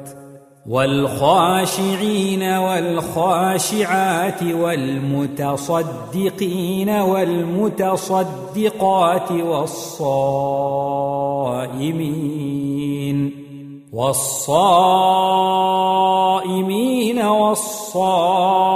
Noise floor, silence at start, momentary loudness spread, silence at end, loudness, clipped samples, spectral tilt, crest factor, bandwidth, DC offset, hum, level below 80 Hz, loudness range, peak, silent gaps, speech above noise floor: -41 dBFS; 0 s; 8 LU; 0 s; -18 LUFS; under 0.1%; -5 dB/octave; 16 dB; 16 kHz; under 0.1%; none; -58 dBFS; 5 LU; -2 dBFS; none; 24 dB